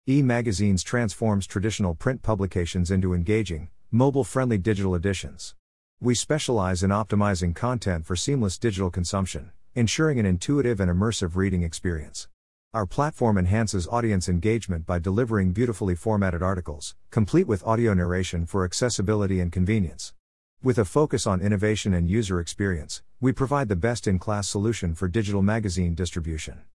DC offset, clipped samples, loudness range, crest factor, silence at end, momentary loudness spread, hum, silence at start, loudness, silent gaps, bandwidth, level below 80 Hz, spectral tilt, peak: 0.3%; under 0.1%; 1 LU; 18 dB; 0.15 s; 8 LU; none; 0.05 s; -25 LUFS; 5.59-5.97 s, 12.34-12.71 s, 20.19-20.57 s; 12 kHz; -44 dBFS; -6 dB/octave; -8 dBFS